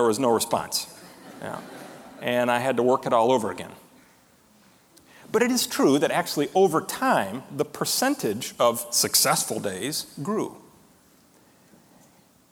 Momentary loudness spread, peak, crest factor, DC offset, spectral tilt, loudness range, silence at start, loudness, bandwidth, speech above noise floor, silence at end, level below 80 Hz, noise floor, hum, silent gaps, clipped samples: 17 LU; -6 dBFS; 20 dB; under 0.1%; -3 dB/octave; 3 LU; 0 s; -24 LUFS; 19.5 kHz; 34 dB; 1.95 s; -68 dBFS; -58 dBFS; none; none; under 0.1%